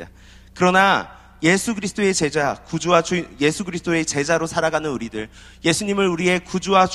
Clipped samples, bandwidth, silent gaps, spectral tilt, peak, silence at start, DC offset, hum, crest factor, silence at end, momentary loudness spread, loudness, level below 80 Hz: under 0.1%; 13.5 kHz; none; -4 dB/octave; 0 dBFS; 0 s; under 0.1%; none; 20 dB; 0 s; 9 LU; -20 LUFS; -48 dBFS